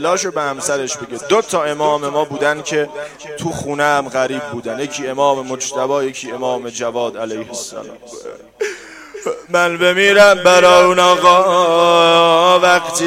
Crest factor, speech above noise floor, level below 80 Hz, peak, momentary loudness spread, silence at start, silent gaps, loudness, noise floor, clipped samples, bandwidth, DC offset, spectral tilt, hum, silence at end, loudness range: 14 dB; 19 dB; -56 dBFS; 0 dBFS; 17 LU; 0 s; none; -14 LUFS; -34 dBFS; under 0.1%; 16 kHz; under 0.1%; -3 dB/octave; none; 0 s; 12 LU